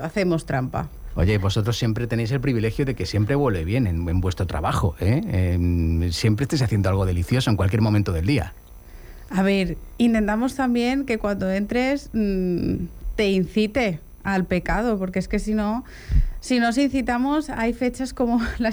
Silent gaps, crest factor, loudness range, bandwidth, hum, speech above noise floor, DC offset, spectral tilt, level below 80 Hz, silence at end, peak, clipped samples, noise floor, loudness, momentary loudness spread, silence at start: none; 14 dB; 2 LU; over 20 kHz; none; 20 dB; under 0.1%; -6.5 dB/octave; -34 dBFS; 0 s; -8 dBFS; under 0.1%; -41 dBFS; -23 LUFS; 5 LU; 0 s